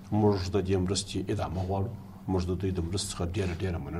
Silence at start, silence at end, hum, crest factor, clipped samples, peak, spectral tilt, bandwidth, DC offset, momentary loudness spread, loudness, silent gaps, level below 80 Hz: 0 s; 0 s; none; 16 dB; under 0.1%; -14 dBFS; -6 dB/octave; 13 kHz; under 0.1%; 7 LU; -30 LUFS; none; -46 dBFS